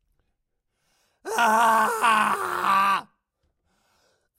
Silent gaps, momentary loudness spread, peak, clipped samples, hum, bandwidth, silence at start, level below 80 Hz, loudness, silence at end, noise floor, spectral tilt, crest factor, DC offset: none; 9 LU; -8 dBFS; under 0.1%; none; 16 kHz; 1.25 s; -70 dBFS; -21 LUFS; 1.35 s; -77 dBFS; -2 dB/octave; 18 dB; under 0.1%